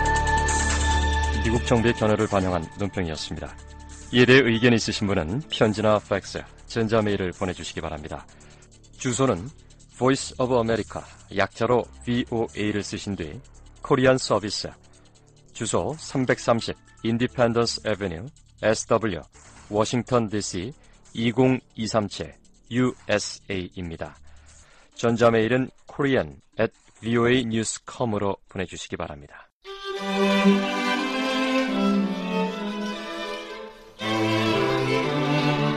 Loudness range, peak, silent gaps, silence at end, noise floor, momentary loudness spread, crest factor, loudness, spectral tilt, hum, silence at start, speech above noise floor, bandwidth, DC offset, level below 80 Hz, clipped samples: 5 LU; -6 dBFS; 29.52-29.61 s; 0 s; -53 dBFS; 15 LU; 18 dB; -24 LUFS; -5 dB/octave; none; 0 s; 29 dB; 12.5 kHz; under 0.1%; -38 dBFS; under 0.1%